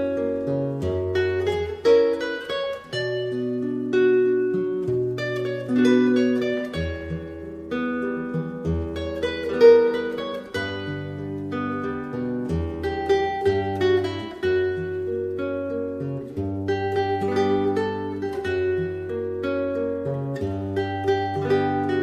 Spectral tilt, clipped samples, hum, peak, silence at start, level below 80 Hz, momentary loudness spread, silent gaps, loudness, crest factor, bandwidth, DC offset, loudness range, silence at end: -7 dB/octave; under 0.1%; none; -4 dBFS; 0 s; -46 dBFS; 10 LU; none; -24 LUFS; 20 dB; 9.6 kHz; under 0.1%; 4 LU; 0 s